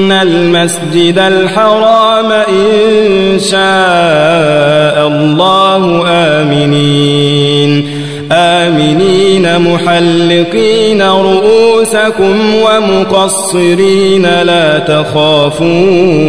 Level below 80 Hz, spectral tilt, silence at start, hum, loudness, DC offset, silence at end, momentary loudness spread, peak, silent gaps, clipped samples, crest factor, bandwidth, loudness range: -42 dBFS; -5 dB/octave; 0 s; none; -7 LUFS; 2%; 0 s; 2 LU; 0 dBFS; none; 2%; 8 dB; 11 kHz; 1 LU